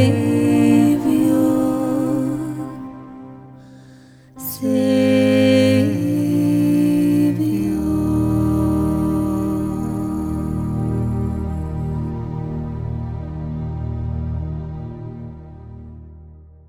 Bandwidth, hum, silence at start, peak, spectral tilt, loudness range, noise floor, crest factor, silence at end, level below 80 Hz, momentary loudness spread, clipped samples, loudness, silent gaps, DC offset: 17.5 kHz; none; 0 s; -2 dBFS; -7.5 dB/octave; 11 LU; -45 dBFS; 18 dB; 0.2 s; -34 dBFS; 18 LU; under 0.1%; -19 LUFS; none; under 0.1%